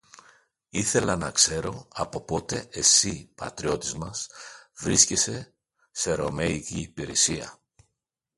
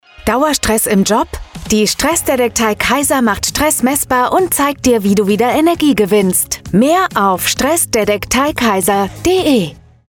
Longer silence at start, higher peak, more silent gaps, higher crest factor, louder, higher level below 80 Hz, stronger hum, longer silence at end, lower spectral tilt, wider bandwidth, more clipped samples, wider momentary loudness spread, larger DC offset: about the same, 0.15 s vs 0.2 s; about the same, -4 dBFS vs -2 dBFS; neither; first, 24 dB vs 12 dB; second, -24 LUFS vs -13 LUFS; second, -50 dBFS vs -36 dBFS; neither; first, 0.85 s vs 0.35 s; second, -2 dB/octave vs -3.5 dB/octave; second, 12 kHz vs 18.5 kHz; neither; first, 18 LU vs 3 LU; neither